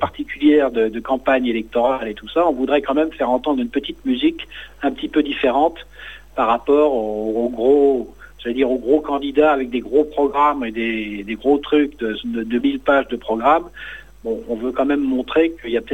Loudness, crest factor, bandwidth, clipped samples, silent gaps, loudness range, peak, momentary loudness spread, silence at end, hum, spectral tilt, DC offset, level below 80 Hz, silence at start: -19 LUFS; 16 dB; 8.4 kHz; under 0.1%; none; 2 LU; -2 dBFS; 10 LU; 0 s; none; -6.5 dB/octave; 0.4%; -46 dBFS; 0 s